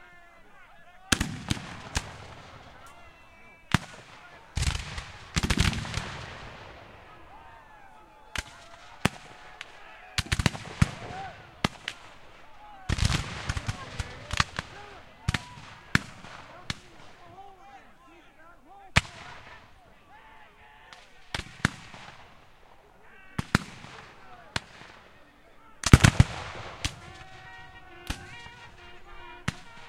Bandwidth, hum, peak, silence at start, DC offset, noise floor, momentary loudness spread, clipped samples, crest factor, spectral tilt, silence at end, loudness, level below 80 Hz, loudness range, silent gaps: 16 kHz; none; 0 dBFS; 0 s; under 0.1%; -54 dBFS; 24 LU; under 0.1%; 32 dB; -4.5 dB/octave; 0 s; -30 LUFS; -40 dBFS; 12 LU; none